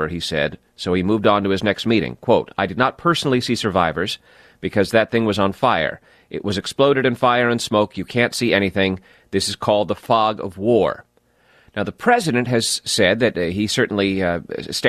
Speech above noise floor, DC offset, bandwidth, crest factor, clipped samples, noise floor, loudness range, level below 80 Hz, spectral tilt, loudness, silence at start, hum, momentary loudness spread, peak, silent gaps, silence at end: 38 dB; under 0.1%; 14 kHz; 16 dB; under 0.1%; -57 dBFS; 2 LU; -50 dBFS; -4.5 dB/octave; -19 LUFS; 0 s; none; 8 LU; -2 dBFS; none; 0 s